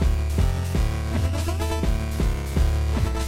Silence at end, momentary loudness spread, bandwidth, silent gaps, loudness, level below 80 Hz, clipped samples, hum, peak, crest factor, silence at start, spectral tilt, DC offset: 0 s; 2 LU; 16 kHz; none; -25 LUFS; -24 dBFS; under 0.1%; none; -8 dBFS; 14 dB; 0 s; -6 dB/octave; under 0.1%